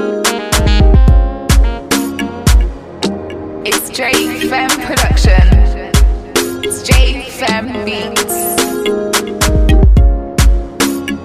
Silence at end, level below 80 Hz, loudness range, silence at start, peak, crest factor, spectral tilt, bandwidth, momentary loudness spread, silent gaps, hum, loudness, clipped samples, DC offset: 0 s; -12 dBFS; 2 LU; 0 s; 0 dBFS; 10 dB; -4.5 dB/octave; 15.5 kHz; 9 LU; none; none; -13 LUFS; under 0.1%; under 0.1%